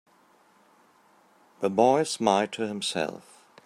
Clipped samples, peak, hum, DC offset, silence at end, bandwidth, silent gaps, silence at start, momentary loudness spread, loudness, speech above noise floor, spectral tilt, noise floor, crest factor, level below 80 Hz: under 0.1%; -6 dBFS; none; under 0.1%; 0.45 s; 15 kHz; none; 1.6 s; 10 LU; -26 LUFS; 36 dB; -4 dB/octave; -61 dBFS; 22 dB; -76 dBFS